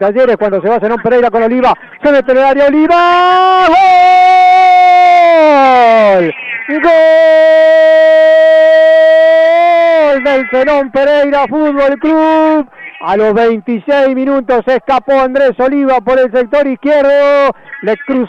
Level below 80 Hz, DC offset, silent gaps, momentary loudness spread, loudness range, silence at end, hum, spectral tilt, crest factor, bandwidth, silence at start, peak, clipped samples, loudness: -44 dBFS; under 0.1%; none; 7 LU; 5 LU; 0 s; none; -5.5 dB/octave; 6 dB; 8 kHz; 0 s; 0 dBFS; under 0.1%; -8 LUFS